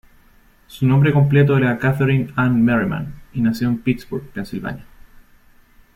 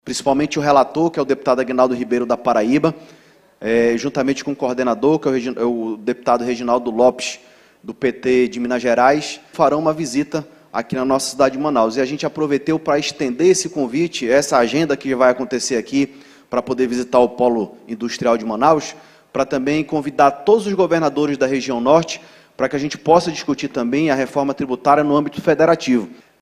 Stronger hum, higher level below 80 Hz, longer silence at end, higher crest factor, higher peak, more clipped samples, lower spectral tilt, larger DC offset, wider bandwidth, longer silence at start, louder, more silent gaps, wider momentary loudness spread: neither; first, -46 dBFS vs -54 dBFS; first, 1.1 s vs 0.3 s; about the same, 16 dB vs 18 dB; second, -4 dBFS vs 0 dBFS; neither; first, -8.5 dB/octave vs -5 dB/octave; neither; about the same, 13.5 kHz vs 14 kHz; first, 0.7 s vs 0.05 s; about the same, -18 LUFS vs -18 LUFS; neither; first, 14 LU vs 8 LU